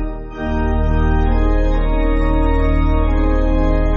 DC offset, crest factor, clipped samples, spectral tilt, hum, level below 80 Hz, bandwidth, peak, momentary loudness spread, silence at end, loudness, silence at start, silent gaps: under 0.1%; 10 dB; under 0.1%; -7.5 dB/octave; none; -16 dBFS; 4.4 kHz; -4 dBFS; 3 LU; 0 s; -18 LUFS; 0 s; none